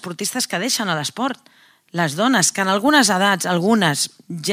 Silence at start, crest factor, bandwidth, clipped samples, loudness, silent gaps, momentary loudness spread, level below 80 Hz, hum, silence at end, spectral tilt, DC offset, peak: 0.05 s; 20 dB; 16.5 kHz; under 0.1%; -18 LUFS; none; 11 LU; -74 dBFS; none; 0 s; -3 dB/octave; under 0.1%; 0 dBFS